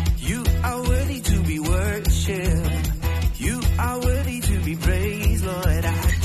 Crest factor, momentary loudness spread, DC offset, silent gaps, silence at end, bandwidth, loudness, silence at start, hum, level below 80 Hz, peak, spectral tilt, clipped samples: 12 dB; 2 LU; under 0.1%; none; 0 s; 13 kHz; -23 LUFS; 0 s; none; -24 dBFS; -8 dBFS; -5.5 dB/octave; under 0.1%